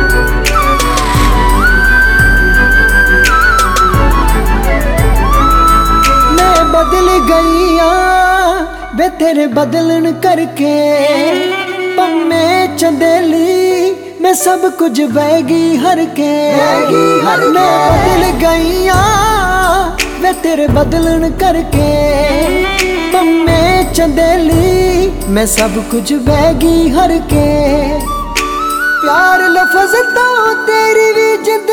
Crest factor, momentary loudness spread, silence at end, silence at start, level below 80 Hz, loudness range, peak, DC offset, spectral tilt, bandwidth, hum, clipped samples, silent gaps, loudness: 10 dB; 5 LU; 0 s; 0 s; -18 dBFS; 3 LU; 0 dBFS; under 0.1%; -4.5 dB/octave; 18.5 kHz; none; under 0.1%; none; -10 LUFS